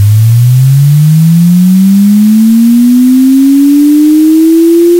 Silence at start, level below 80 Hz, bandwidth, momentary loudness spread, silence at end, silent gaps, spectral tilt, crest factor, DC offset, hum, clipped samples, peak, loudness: 0 s; -46 dBFS; 17 kHz; 1 LU; 0 s; none; -8 dB/octave; 4 dB; under 0.1%; none; 0.5%; 0 dBFS; -5 LUFS